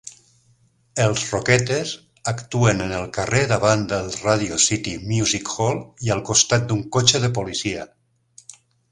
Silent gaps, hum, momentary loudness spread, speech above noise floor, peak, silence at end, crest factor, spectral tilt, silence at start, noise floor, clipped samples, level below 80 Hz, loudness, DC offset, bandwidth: none; none; 11 LU; 39 dB; 0 dBFS; 0.4 s; 22 dB; -3.5 dB/octave; 0.05 s; -60 dBFS; under 0.1%; -48 dBFS; -20 LUFS; under 0.1%; 11.5 kHz